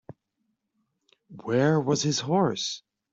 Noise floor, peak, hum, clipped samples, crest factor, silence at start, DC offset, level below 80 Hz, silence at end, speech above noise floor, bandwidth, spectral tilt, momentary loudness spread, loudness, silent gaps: -78 dBFS; -10 dBFS; none; under 0.1%; 18 dB; 1.3 s; under 0.1%; -68 dBFS; 0.35 s; 53 dB; 8 kHz; -5 dB/octave; 12 LU; -25 LUFS; none